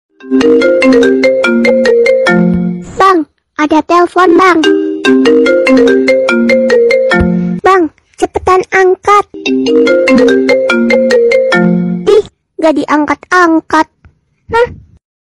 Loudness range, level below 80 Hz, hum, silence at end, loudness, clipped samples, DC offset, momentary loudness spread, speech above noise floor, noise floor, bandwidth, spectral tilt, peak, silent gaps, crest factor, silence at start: 2 LU; -38 dBFS; none; 0.6 s; -8 LUFS; 2%; under 0.1%; 6 LU; 38 dB; -46 dBFS; 11.5 kHz; -6 dB/octave; 0 dBFS; none; 8 dB; 0.25 s